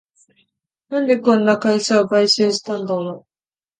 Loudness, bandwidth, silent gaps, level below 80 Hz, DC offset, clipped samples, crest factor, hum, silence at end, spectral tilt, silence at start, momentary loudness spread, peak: -17 LUFS; 9.6 kHz; none; -66 dBFS; under 0.1%; under 0.1%; 18 dB; none; 0.6 s; -4 dB/octave; 0.9 s; 10 LU; -2 dBFS